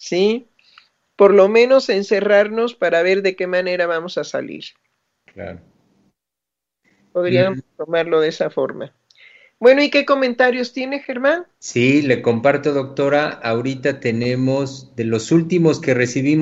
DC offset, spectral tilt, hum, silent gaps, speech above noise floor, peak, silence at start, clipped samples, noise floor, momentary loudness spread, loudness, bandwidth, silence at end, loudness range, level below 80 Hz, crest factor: under 0.1%; -6 dB/octave; none; none; 67 dB; 0 dBFS; 0 s; under 0.1%; -84 dBFS; 13 LU; -17 LUFS; 8 kHz; 0 s; 9 LU; -64 dBFS; 18 dB